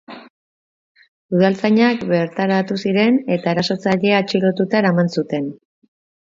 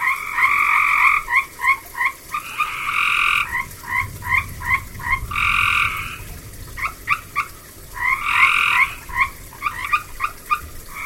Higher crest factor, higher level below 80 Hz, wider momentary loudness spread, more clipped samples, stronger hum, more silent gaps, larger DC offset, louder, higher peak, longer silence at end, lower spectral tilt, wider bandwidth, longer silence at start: about the same, 18 dB vs 20 dB; second, -62 dBFS vs -40 dBFS; second, 6 LU vs 13 LU; neither; neither; first, 0.30-0.95 s, 1.08-1.29 s vs none; neither; about the same, -17 LUFS vs -19 LUFS; about the same, -2 dBFS vs -2 dBFS; first, 0.85 s vs 0 s; first, -7 dB/octave vs -1.5 dB/octave; second, 7.6 kHz vs 17 kHz; about the same, 0.1 s vs 0 s